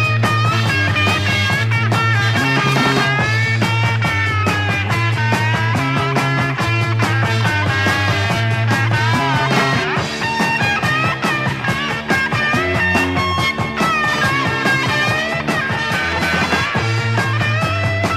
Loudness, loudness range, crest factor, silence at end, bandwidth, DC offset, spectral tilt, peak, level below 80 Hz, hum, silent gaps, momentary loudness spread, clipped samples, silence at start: -16 LUFS; 2 LU; 14 dB; 0 s; 15 kHz; under 0.1%; -5 dB/octave; -2 dBFS; -42 dBFS; none; none; 3 LU; under 0.1%; 0 s